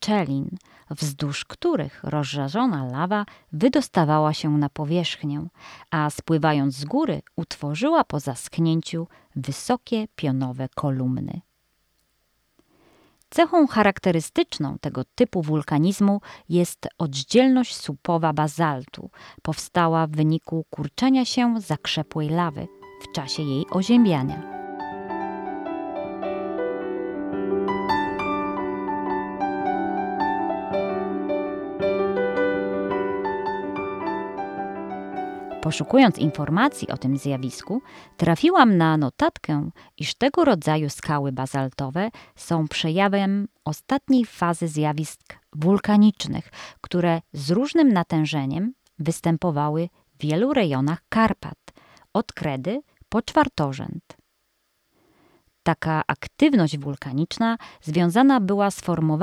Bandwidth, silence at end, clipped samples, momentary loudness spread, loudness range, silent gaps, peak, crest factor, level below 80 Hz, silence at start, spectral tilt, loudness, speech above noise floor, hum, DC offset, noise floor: 14 kHz; 0 s; under 0.1%; 12 LU; 5 LU; none; -4 dBFS; 20 dB; -56 dBFS; 0 s; -6 dB/octave; -23 LUFS; 48 dB; none; under 0.1%; -71 dBFS